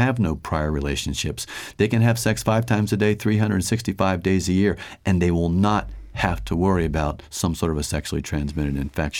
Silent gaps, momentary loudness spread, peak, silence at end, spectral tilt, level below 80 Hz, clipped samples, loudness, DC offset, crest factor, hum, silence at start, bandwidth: none; 7 LU; -6 dBFS; 0 s; -5.5 dB/octave; -36 dBFS; under 0.1%; -22 LUFS; under 0.1%; 16 dB; none; 0 s; 17.5 kHz